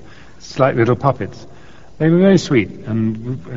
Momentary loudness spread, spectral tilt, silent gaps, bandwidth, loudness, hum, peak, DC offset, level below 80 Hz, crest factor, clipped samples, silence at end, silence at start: 14 LU; -6.5 dB/octave; none; 7.6 kHz; -16 LUFS; none; 0 dBFS; 1%; -46 dBFS; 16 dB; under 0.1%; 0 s; 0.4 s